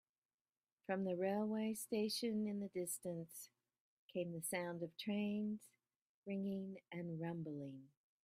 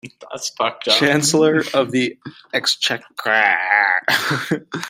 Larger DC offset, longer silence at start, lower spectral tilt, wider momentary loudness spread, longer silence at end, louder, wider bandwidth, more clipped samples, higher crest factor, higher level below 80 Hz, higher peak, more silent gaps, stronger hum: neither; first, 0.9 s vs 0.05 s; first, -5 dB/octave vs -3 dB/octave; about the same, 12 LU vs 10 LU; first, 0.35 s vs 0 s; second, -44 LUFS vs -17 LUFS; about the same, 15.5 kHz vs 16 kHz; neither; about the same, 18 dB vs 18 dB; second, -86 dBFS vs -64 dBFS; second, -28 dBFS vs 0 dBFS; first, 3.80-4.09 s, 6.02-6.23 s vs none; neither